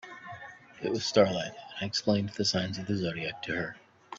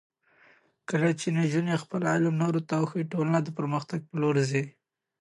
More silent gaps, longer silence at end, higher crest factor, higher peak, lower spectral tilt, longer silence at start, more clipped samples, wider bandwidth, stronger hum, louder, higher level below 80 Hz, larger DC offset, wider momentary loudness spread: neither; second, 0 s vs 0.5 s; first, 24 dB vs 16 dB; first, -8 dBFS vs -12 dBFS; second, -4.5 dB/octave vs -6.5 dB/octave; second, 0.05 s vs 0.9 s; neither; second, 7.8 kHz vs 11.5 kHz; neither; about the same, -30 LUFS vs -28 LUFS; first, -66 dBFS vs -74 dBFS; neither; first, 19 LU vs 6 LU